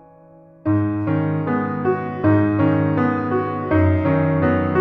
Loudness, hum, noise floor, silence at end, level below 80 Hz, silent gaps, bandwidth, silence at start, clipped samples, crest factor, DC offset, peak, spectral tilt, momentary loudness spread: -19 LUFS; none; -46 dBFS; 0 s; -46 dBFS; none; 4.8 kHz; 0.65 s; under 0.1%; 14 dB; under 0.1%; -4 dBFS; -11 dB/octave; 5 LU